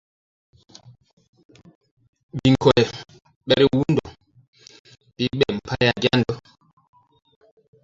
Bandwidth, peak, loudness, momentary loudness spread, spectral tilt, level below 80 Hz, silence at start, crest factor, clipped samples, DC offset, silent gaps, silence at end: 7.8 kHz; -2 dBFS; -20 LUFS; 15 LU; -6.5 dB/octave; -50 dBFS; 2.35 s; 22 dB; under 0.1%; under 0.1%; 3.36-3.41 s, 4.48-4.53 s, 4.79-4.84 s; 1.45 s